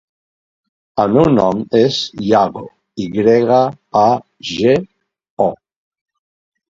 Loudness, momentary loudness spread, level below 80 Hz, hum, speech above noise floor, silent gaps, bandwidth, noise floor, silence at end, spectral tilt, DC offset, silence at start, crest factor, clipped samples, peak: -15 LUFS; 12 LU; -48 dBFS; none; over 76 dB; 5.30-5.37 s; 7.6 kHz; under -90 dBFS; 1.2 s; -6.5 dB/octave; under 0.1%; 0.95 s; 16 dB; under 0.1%; 0 dBFS